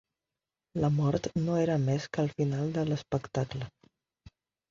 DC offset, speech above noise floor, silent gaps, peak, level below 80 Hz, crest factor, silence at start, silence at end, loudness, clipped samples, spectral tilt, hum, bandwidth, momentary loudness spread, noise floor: under 0.1%; 61 dB; none; -14 dBFS; -58 dBFS; 18 dB; 0.75 s; 1 s; -31 LUFS; under 0.1%; -7.5 dB/octave; none; 7.4 kHz; 8 LU; -90 dBFS